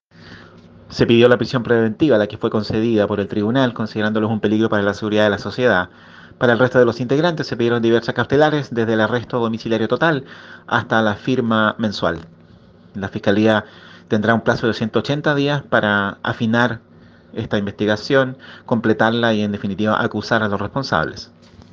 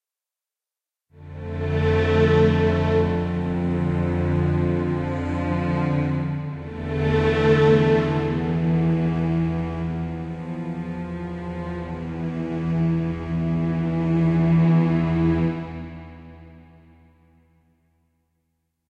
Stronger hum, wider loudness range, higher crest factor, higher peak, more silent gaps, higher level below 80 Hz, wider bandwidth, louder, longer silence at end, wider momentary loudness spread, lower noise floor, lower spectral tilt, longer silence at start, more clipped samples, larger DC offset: neither; second, 3 LU vs 7 LU; about the same, 18 dB vs 18 dB; first, 0 dBFS vs -6 dBFS; neither; second, -54 dBFS vs -40 dBFS; about the same, 7.2 kHz vs 7 kHz; first, -18 LUFS vs -22 LUFS; second, 0.45 s vs 2.3 s; second, 7 LU vs 13 LU; second, -46 dBFS vs -90 dBFS; second, -6.5 dB/octave vs -9 dB/octave; second, 0.25 s vs 1.15 s; neither; neither